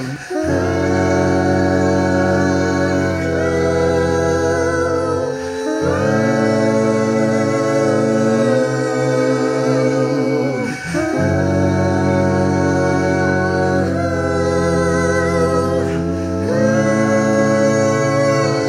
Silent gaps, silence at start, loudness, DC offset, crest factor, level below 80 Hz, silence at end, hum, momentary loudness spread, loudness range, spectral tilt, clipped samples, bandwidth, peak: none; 0 s; -16 LUFS; under 0.1%; 12 dB; -42 dBFS; 0 s; none; 4 LU; 1 LU; -6.5 dB/octave; under 0.1%; 13.5 kHz; -2 dBFS